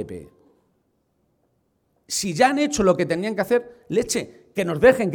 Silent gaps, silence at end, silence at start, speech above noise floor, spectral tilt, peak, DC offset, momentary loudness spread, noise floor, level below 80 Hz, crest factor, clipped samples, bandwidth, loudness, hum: none; 0 s; 0 s; 47 dB; -4.5 dB/octave; -2 dBFS; under 0.1%; 11 LU; -68 dBFS; -52 dBFS; 20 dB; under 0.1%; 18.5 kHz; -21 LUFS; none